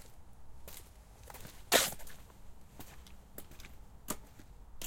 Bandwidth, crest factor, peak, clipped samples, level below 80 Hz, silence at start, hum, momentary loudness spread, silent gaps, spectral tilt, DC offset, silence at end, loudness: 17 kHz; 32 dB; -10 dBFS; under 0.1%; -56 dBFS; 0 s; none; 29 LU; none; -1 dB/octave; under 0.1%; 0 s; -33 LUFS